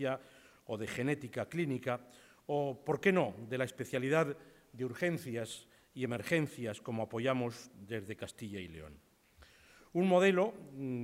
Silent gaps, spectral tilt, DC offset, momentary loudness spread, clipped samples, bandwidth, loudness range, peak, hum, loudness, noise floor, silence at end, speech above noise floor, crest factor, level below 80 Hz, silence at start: none; -6 dB/octave; under 0.1%; 15 LU; under 0.1%; 16 kHz; 4 LU; -16 dBFS; none; -36 LUFS; -63 dBFS; 0 s; 28 dB; 20 dB; -72 dBFS; 0 s